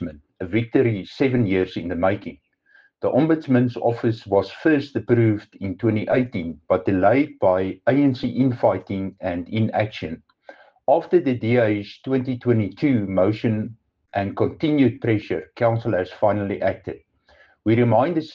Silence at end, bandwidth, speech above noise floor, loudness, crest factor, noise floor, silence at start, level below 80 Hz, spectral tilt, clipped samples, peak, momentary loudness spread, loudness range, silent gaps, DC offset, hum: 0 s; 6.8 kHz; 36 dB; -21 LUFS; 16 dB; -57 dBFS; 0 s; -56 dBFS; -9.5 dB/octave; under 0.1%; -4 dBFS; 10 LU; 2 LU; none; under 0.1%; none